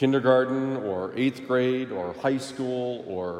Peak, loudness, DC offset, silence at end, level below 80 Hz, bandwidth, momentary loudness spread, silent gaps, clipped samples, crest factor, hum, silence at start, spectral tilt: -6 dBFS; -26 LUFS; under 0.1%; 0 s; -72 dBFS; 11 kHz; 9 LU; none; under 0.1%; 18 dB; none; 0 s; -6.5 dB/octave